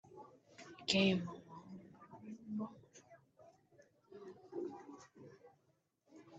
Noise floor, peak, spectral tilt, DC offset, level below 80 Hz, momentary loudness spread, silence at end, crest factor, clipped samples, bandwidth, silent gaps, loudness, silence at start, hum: -79 dBFS; -16 dBFS; -5 dB/octave; under 0.1%; -80 dBFS; 27 LU; 0 s; 28 dB; under 0.1%; 8.8 kHz; none; -39 LUFS; 0.05 s; none